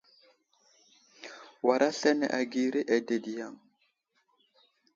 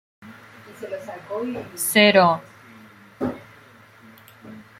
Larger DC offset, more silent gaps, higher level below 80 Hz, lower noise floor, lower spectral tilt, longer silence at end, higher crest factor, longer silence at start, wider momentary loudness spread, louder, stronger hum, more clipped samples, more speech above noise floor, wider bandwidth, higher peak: neither; neither; second, -82 dBFS vs -66 dBFS; first, -74 dBFS vs -49 dBFS; about the same, -4 dB/octave vs -3.5 dB/octave; first, 1.4 s vs 0.2 s; about the same, 22 dB vs 24 dB; first, 1.2 s vs 0.2 s; second, 21 LU vs 25 LU; second, -29 LUFS vs -20 LUFS; neither; neither; first, 46 dB vs 29 dB; second, 7.8 kHz vs 16 kHz; second, -10 dBFS vs -2 dBFS